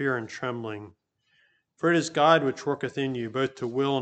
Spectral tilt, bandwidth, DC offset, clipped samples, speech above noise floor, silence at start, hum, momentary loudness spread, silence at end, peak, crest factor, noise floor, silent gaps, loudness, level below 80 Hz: -5 dB/octave; 9 kHz; under 0.1%; under 0.1%; 41 dB; 0 s; none; 12 LU; 0 s; -6 dBFS; 22 dB; -67 dBFS; none; -26 LUFS; -72 dBFS